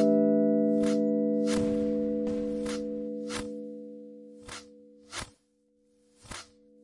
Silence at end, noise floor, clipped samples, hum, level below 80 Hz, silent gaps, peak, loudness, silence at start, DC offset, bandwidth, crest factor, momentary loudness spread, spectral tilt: 0.4 s; -70 dBFS; under 0.1%; none; -58 dBFS; none; -14 dBFS; -29 LUFS; 0 s; under 0.1%; 11.5 kHz; 16 dB; 20 LU; -6 dB/octave